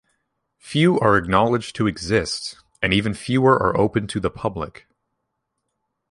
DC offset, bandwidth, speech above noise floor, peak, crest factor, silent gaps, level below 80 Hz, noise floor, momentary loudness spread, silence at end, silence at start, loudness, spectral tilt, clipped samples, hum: under 0.1%; 11.5 kHz; 57 dB; -2 dBFS; 20 dB; none; -44 dBFS; -77 dBFS; 10 LU; 1.4 s; 0.65 s; -20 LUFS; -5.5 dB/octave; under 0.1%; none